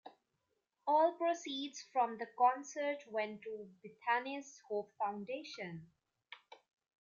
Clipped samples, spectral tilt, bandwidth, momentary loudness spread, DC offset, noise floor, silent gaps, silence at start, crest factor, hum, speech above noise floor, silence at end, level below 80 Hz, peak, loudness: under 0.1%; -3.5 dB/octave; 7.4 kHz; 18 LU; under 0.1%; -85 dBFS; none; 0.05 s; 20 dB; none; 47 dB; 0.65 s; under -90 dBFS; -20 dBFS; -38 LUFS